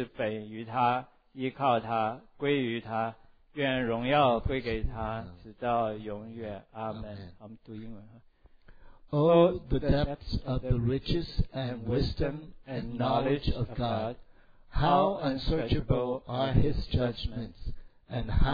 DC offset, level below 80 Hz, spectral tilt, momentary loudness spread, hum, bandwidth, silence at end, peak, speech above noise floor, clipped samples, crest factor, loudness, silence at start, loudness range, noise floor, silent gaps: under 0.1%; -40 dBFS; -9 dB/octave; 18 LU; none; 5 kHz; 0 s; -10 dBFS; 26 dB; under 0.1%; 20 dB; -30 LUFS; 0 s; 7 LU; -55 dBFS; none